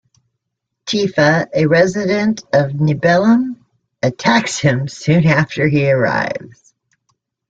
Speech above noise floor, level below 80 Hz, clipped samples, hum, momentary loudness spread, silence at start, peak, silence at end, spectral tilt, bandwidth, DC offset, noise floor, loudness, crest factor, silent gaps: 62 dB; -52 dBFS; under 0.1%; none; 9 LU; 0.85 s; 0 dBFS; 1 s; -6 dB/octave; 9 kHz; under 0.1%; -77 dBFS; -15 LUFS; 14 dB; none